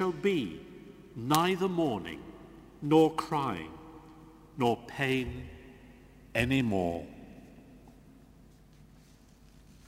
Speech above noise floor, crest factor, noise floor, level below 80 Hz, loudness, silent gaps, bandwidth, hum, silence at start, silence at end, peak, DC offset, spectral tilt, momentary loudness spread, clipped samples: 28 dB; 28 dB; -58 dBFS; -56 dBFS; -30 LUFS; none; 16 kHz; none; 0 s; 2 s; -4 dBFS; under 0.1%; -5.5 dB/octave; 24 LU; under 0.1%